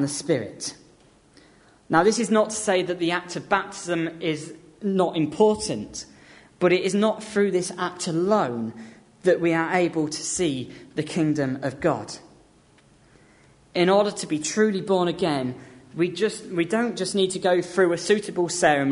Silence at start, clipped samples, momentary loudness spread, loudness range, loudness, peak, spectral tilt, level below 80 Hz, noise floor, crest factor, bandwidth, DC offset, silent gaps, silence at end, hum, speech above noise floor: 0 s; under 0.1%; 12 LU; 3 LU; -24 LUFS; -4 dBFS; -4.5 dB/octave; -60 dBFS; -56 dBFS; 20 dB; 11 kHz; under 0.1%; none; 0 s; none; 33 dB